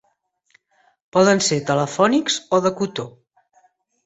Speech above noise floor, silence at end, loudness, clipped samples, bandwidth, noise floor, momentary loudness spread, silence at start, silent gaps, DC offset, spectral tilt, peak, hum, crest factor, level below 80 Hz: 49 dB; 0.95 s; -19 LUFS; under 0.1%; 8.2 kHz; -67 dBFS; 10 LU; 1.15 s; none; under 0.1%; -4 dB/octave; -2 dBFS; none; 20 dB; -62 dBFS